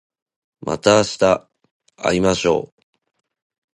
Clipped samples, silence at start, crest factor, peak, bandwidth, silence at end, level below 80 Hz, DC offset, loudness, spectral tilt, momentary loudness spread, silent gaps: under 0.1%; 0.65 s; 20 dB; 0 dBFS; 11.5 kHz; 1.1 s; -48 dBFS; under 0.1%; -18 LUFS; -4.5 dB/octave; 12 LU; 1.71-1.80 s